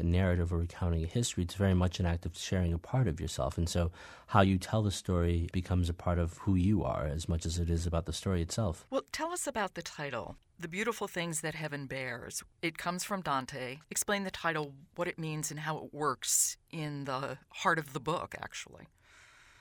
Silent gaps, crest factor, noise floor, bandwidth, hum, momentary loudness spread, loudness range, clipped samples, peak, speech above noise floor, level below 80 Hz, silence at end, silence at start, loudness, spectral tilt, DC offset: none; 24 dB; -60 dBFS; 19.5 kHz; none; 10 LU; 5 LU; under 0.1%; -10 dBFS; 27 dB; -46 dBFS; 0.75 s; 0 s; -34 LUFS; -5 dB/octave; under 0.1%